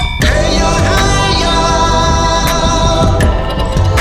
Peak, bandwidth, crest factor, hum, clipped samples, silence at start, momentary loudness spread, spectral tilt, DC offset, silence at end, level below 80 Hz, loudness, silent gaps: 0 dBFS; 16 kHz; 10 dB; none; under 0.1%; 0 s; 2 LU; -4.5 dB/octave; under 0.1%; 0 s; -16 dBFS; -11 LUFS; none